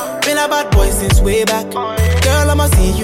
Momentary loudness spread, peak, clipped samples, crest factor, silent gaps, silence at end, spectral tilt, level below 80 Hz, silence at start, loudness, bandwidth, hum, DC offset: 4 LU; -2 dBFS; under 0.1%; 12 dB; none; 0 s; -4.5 dB/octave; -16 dBFS; 0 s; -14 LUFS; 16.5 kHz; none; under 0.1%